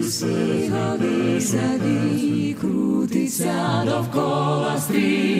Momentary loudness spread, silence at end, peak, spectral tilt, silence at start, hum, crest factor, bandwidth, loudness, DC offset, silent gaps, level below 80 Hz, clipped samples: 2 LU; 0 s; -8 dBFS; -5.5 dB/octave; 0 s; none; 12 dB; 16 kHz; -21 LUFS; under 0.1%; none; -60 dBFS; under 0.1%